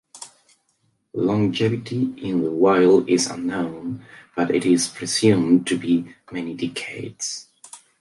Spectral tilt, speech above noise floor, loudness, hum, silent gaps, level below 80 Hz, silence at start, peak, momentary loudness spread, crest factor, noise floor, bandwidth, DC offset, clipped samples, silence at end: -5 dB/octave; 47 dB; -21 LUFS; none; none; -60 dBFS; 0.15 s; -4 dBFS; 17 LU; 18 dB; -68 dBFS; 11.5 kHz; under 0.1%; under 0.1%; 0.25 s